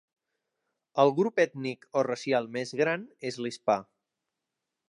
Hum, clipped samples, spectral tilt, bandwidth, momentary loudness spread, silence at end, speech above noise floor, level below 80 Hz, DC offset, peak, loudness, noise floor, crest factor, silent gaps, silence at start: none; under 0.1%; -5.5 dB/octave; 11 kHz; 10 LU; 1.05 s; 58 dB; -80 dBFS; under 0.1%; -8 dBFS; -29 LUFS; -86 dBFS; 22 dB; none; 0.95 s